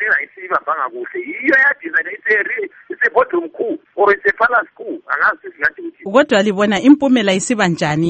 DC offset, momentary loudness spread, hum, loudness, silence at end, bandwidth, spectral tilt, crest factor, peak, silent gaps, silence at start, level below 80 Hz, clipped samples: under 0.1%; 11 LU; none; -15 LUFS; 0 s; 8.8 kHz; -4.5 dB/octave; 16 dB; 0 dBFS; none; 0 s; -56 dBFS; under 0.1%